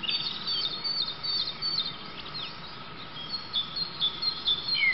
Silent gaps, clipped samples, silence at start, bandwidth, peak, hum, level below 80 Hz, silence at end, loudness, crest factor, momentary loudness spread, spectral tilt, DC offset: none; under 0.1%; 0 s; 6 kHz; -16 dBFS; none; -60 dBFS; 0 s; -29 LUFS; 16 dB; 13 LU; -4.5 dB/octave; 0.5%